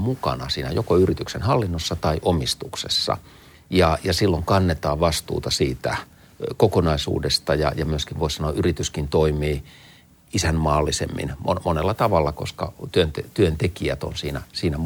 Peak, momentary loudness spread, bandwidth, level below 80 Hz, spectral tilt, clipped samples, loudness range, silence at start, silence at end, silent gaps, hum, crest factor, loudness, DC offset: -2 dBFS; 8 LU; 19 kHz; -38 dBFS; -5 dB/octave; under 0.1%; 2 LU; 0 s; 0 s; none; none; 20 dB; -22 LUFS; under 0.1%